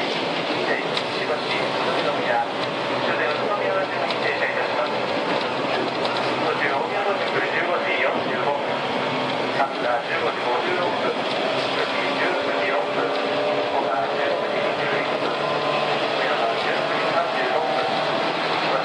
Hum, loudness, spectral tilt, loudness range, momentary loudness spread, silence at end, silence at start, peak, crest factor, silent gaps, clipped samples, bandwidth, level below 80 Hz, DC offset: none; -22 LUFS; -4.5 dB/octave; 1 LU; 2 LU; 0 s; 0 s; -6 dBFS; 16 dB; none; under 0.1%; 10.5 kHz; -72 dBFS; under 0.1%